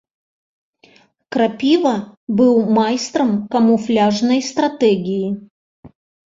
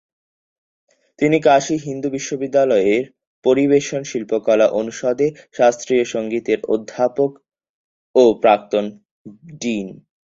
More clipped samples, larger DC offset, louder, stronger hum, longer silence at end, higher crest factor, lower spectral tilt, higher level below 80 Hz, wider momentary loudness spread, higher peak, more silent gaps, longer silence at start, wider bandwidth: neither; neither; about the same, -17 LUFS vs -18 LUFS; neither; first, 0.45 s vs 0.3 s; about the same, 14 dB vs 18 dB; about the same, -5.5 dB/octave vs -5 dB/octave; about the same, -60 dBFS vs -60 dBFS; about the same, 8 LU vs 9 LU; about the same, -2 dBFS vs -2 dBFS; second, 2.17-2.27 s, 5.50-5.83 s vs 3.27-3.42 s, 7.69-8.14 s, 9.11-9.25 s; about the same, 1.3 s vs 1.2 s; about the same, 7.8 kHz vs 7.8 kHz